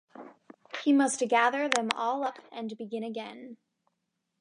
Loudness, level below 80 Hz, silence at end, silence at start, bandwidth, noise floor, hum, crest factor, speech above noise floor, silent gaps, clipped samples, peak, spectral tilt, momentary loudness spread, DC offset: -29 LUFS; -86 dBFS; 0.85 s; 0.15 s; 11 kHz; -81 dBFS; none; 26 dB; 53 dB; none; under 0.1%; -6 dBFS; -2.5 dB/octave; 21 LU; under 0.1%